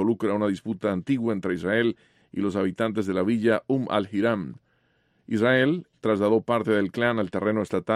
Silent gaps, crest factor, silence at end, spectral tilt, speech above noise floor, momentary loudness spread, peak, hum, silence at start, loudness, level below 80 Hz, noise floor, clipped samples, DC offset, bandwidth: none; 16 dB; 0 s; -7 dB/octave; 43 dB; 6 LU; -8 dBFS; none; 0 s; -25 LUFS; -64 dBFS; -67 dBFS; under 0.1%; under 0.1%; 12 kHz